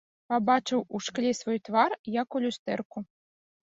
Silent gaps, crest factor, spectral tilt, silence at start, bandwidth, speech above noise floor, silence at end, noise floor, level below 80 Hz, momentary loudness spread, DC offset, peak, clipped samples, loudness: 1.99-2.04 s, 2.59-2.66 s, 2.85-2.90 s; 20 dB; -4.5 dB/octave; 0.3 s; 7.8 kHz; over 62 dB; 0.65 s; under -90 dBFS; -72 dBFS; 9 LU; under 0.1%; -10 dBFS; under 0.1%; -29 LUFS